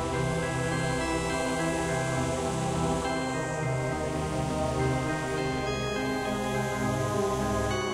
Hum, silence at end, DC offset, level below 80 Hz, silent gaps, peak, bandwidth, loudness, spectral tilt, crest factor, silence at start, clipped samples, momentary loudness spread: none; 0 s; under 0.1%; -44 dBFS; none; -16 dBFS; 15.5 kHz; -29 LUFS; -5 dB/octave; 12 dB; 0 s; under 0.1%; 2 LU